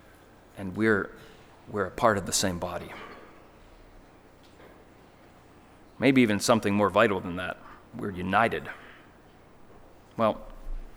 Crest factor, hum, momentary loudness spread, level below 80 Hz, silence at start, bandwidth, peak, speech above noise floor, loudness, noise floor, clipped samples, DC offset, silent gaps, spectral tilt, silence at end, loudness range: 22 dB; none; 21 LU; -50 dBFS; 0.55 s; over 20 kHz; -6 dBFS; 28 dB; -26 LUFS; -54 dBFS; under 0.1%; under 0.1%; none; -4.5 dB/octave; 0 s; 7 LU